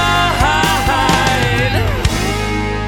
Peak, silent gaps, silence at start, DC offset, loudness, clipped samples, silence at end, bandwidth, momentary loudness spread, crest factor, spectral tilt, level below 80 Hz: 0 dBFS; none; 0 s; under 0.1%; -14 LUFS; under 0.1%; 0 s; 18.5 kHz; 5 LU; 14 dB; -4 dB/octave; -24 dBFS